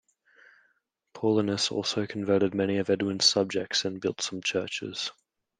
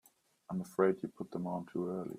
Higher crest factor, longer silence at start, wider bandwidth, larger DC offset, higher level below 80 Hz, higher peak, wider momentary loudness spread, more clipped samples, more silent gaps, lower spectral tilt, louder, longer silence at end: about the same, 20 dB vs 22 dB; first, 1.15 s vs 0.5 s; second, 10.5 kHz vs 15 kHz; neither; first, -72 dBFS vs -78 dBFS; first, -8 dBFS vs -16 dBFS; about the same, 9 LU vs 10 LU; neither; neither; second, -3.5 dB/octave vs -8 dB/octave; first, -27 LUFS vs -37 LUFS; first, 0.5 s vs 0 s